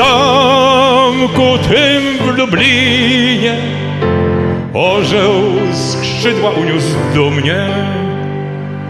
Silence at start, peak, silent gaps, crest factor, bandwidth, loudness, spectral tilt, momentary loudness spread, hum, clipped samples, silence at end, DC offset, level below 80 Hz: 0 s; 0 dBFS; none; 12 dB; 13.5 kHz; -11 LUFS; -5 dB/octave; 8 LU; none; under 0.1%; 0 s; under 0.1%; -40 dBFS